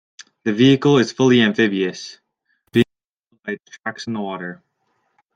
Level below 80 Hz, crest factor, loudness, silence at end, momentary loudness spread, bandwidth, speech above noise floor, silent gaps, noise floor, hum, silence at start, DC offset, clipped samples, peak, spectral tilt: -62 dBFS; 18 dB; -18 LUFS; 0.8 s; 17 LU; 9.2 kHz; 51 dB; 3.09-3.23 s; -69 dBFS; none; 0.45 s; under 0.1%; under 0.1%; -2 dBFS; -6 dB/octave